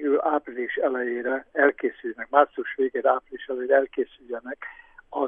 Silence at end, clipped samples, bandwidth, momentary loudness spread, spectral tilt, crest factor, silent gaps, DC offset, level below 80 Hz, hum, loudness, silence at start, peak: 0 s; under 0.1%; 3.7 kHz; 14 LU; -7 dB/octave; 20 dB; none; under 0.1%; -66 dBFS; none; -25 LUFS; 0 s; -4 dBFS